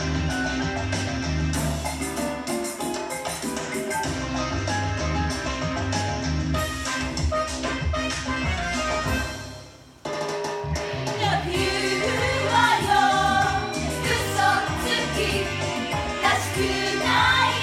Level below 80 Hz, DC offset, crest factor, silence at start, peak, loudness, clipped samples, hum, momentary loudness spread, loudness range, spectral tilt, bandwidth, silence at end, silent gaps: -36 dBFS; under 0.1%; 18 dB; 0 s; -6 dBFS; -24 LUFS; under 0.1%; none; 9 LU; 6 LU; -4 dB/octave; 16.5 kHz; 0 s; none